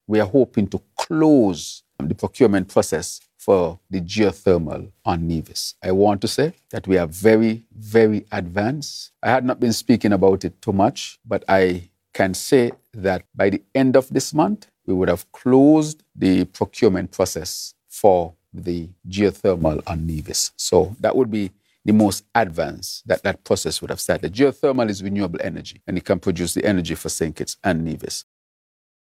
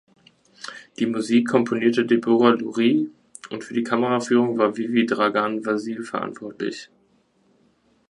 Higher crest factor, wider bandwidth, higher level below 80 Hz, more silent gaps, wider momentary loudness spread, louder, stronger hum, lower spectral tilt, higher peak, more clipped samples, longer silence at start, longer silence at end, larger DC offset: about the same, 20 dB vs 20 dB; first, 16 kHz vs 11 kHz; first, -46 dBFS vs -70 dBFS; neither; second, 11 LU vs 16 LU; about the same, -20 LUFS vs -22 LUFS; neither; about the same, -5.5 dB/octave vs -5.5 dB/octave; about the same, 0 dBFS vs -2 dBFS; neither; second, 0.1 s vs 0.6 s; second, 0.95 s vs 1.25 s; neither